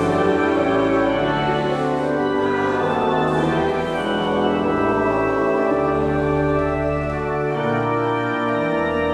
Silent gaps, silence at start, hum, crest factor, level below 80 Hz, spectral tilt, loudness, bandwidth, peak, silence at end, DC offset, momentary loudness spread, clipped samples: none; 0 s; none; 12 dB; -40 dBFS; -7 dB/octave; -20 LUFS; 11 kHz; -6 dBFS; 0 s; under 0.1%; 3 LU; under 0.1%